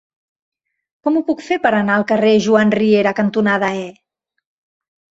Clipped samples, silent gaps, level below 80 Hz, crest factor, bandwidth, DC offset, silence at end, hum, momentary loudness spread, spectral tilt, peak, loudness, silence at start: under 0.1%; none; -60 dBFS; 16 dB; 7.8 kHz; under 0.1%; 1.2 s; none; 8 LU; -6 dB/octave; -2 dBFS; -15 LUFS; 1.05 s